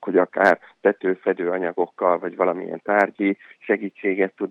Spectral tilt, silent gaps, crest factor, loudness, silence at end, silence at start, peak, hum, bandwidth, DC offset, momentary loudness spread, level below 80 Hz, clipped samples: -7.5 dB/octave; none; 18 dB; -22 LUFS; 0 s; 0 s; -4 dBFS; none; 8 kHz; under 0.1%; 6 LU; -76 dBFS; under 0.1%